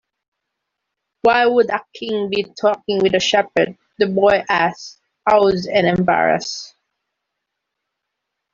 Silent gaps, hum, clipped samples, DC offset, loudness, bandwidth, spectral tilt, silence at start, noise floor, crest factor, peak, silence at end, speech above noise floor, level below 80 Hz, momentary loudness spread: none; none; under 0.1%; under 0.1%; -17 LUFS; 7.6 kHz; -4.5 dB/octave; 1.25 s; -79 dBFS; 16 dB; -2 dBFS; 1.85 s; 62 dB; -54 dBFS; 9 LU